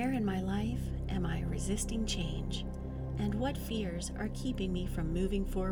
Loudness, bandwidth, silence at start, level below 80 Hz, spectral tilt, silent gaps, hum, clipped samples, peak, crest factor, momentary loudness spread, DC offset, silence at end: -36 LUFS; 18 kHz; 0 s; -40 dBFS; -5.5 dB/octave; none; none; under 0.1%; -22 dBFS; 12 dB; 5 LU; under 0.1%; 0 s